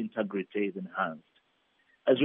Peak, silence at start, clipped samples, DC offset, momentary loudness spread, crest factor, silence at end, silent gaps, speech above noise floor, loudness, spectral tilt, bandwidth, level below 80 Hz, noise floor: -12 dBFS; 0 s; under 0.1%; under 0.1%; 4 LU; 20 dB; 0 s; none; 38 dB; -33 LUFS; -4 dB/octave; 3.9 kHz; -86 dBFS; -71 dBFS